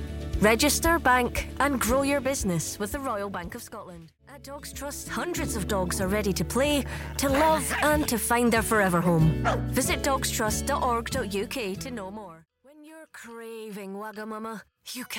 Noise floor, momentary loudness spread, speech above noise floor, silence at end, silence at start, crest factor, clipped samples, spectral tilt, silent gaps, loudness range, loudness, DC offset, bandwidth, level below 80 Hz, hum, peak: -53 dBFS; 17 LU; 27 dB; 0 s; 0 s; 18 dB; under 0.1%; -4 dB/octave; none; 10 LU; -26 LUFS; under 0.1%; 17 kHz; -40 dBFS; none; -10 dBFS